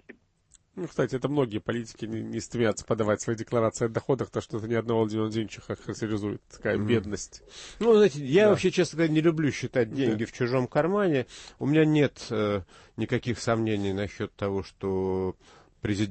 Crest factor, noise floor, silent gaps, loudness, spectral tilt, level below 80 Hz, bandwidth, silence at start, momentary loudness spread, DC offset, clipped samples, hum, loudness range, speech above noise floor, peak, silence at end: 16 dB; -63 dBFS; none; -27 LUFS; -6 dB/octave; -56 dBFS; 8.8 kHz; 0.1 s; 13 LU; under 0.1%; under 0.1%; none; 6 LU; 36 dB; -10 dBFS; 0 s